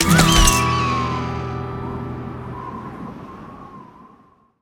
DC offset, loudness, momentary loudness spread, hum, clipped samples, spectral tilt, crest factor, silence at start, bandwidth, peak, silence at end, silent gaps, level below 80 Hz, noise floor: under 0.1%; -18 LUFS; 24 LU; none; under 0.1%; -3.5 dB/octave; 20 dB; 0 s; 18 kHz; 0 dBFS; 0.75 s; none; -28 dBFS; -53 dBFS